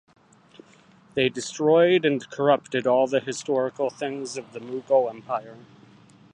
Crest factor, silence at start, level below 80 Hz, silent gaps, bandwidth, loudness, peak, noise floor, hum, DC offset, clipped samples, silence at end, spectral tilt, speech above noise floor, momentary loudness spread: 18 dB; 1.15 s; -70 dBFS; none; 10 kHz; -24 LUFS; -6 dBFS; -55 dBFS; none; under 0.1%; under 0.1%; 0.7 s; -4.5 dB/octave; 31 dB; 14 LU